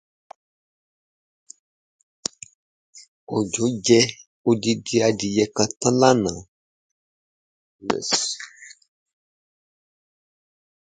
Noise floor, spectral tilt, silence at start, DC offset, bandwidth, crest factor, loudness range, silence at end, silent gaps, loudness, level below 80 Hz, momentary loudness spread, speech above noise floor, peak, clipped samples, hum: under -90 dBFS; -4 dB/octave; 2.95 s; under 0.1%; 9.6 kHz; 24 dB; 10 LU; 2.15 s; 3.08-3.27 s, 4.27-4.44 s, 6.48-7.79 s; -21 LUFS; -60 dBFS; 16 LU; over 70 dB; -2 dBFS; under 0.1%; none